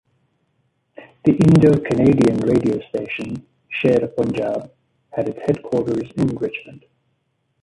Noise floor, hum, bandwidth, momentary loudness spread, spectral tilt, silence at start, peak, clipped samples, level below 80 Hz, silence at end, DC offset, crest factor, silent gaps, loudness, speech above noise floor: -69 dBFS; none; 11.5 kHz; 15 LU; -8.5 dB/octave; 1 s; -2 dBFS; under 0.1%; -48 dBFS; 0.85 s; under 0.1%; 16 dB; none; -19 LUFS; 51 dB